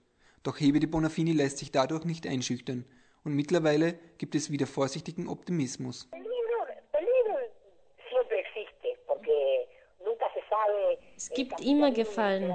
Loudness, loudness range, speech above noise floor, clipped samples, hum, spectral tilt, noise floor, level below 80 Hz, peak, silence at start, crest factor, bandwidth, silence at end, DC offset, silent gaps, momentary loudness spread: -30 LUFS; 3 LU; 29 dB; under 0.1%; none; -5.5 dB/octave; -58 dBFS; -62 dBFS; -12 dBFS; 0.45 s; 18 dB; 9.2 kHz; 0 s; under 0.1%; none; 12 LU